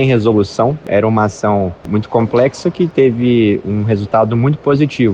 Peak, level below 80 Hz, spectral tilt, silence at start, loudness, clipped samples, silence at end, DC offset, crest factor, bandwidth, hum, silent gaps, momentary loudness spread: 0 dBFS; -46 dBFS; -7.5 dB/octave; 0 s; -14 LUFS; under 0.1%; 0 s; under 0.1%; 12 dB; 9 kHz; none; none; 4 LU